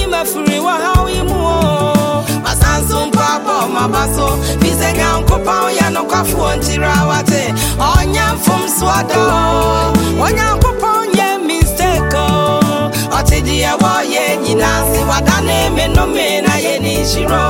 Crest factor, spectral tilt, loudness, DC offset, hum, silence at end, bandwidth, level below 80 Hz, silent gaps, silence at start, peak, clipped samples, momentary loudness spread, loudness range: 12 dB; -4.5 dB/octave; -13 LUFS; under 0.1%; none; 0 s; 17 kHz; -20 dBFS; none; 0 s; 0 dBFS; under 0.1%; 2 LU; 1 LU